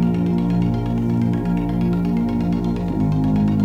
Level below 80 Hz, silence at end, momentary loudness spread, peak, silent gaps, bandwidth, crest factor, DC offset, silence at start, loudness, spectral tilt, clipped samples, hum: -34 dBFS; 0 s; 3 LU; -8 dBFS; none; 6.6 kHz; 10 dB; under 0.1%; 0 s; -20 LUFS; -9.5 dB/octave; under 0.1%; none